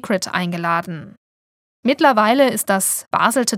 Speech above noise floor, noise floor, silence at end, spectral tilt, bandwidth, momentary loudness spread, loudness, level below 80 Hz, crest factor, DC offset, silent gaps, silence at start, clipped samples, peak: over 73 dB; under -90 dBFS; 0 s; -3.5 dB/octave; 17.5 kHz; 9 LU; -17 LUFS; -68 dBFS; 18 dB; under 0.1%; 1.17-1.83 s; 0.05 s; under 0.1%; 0 dBFS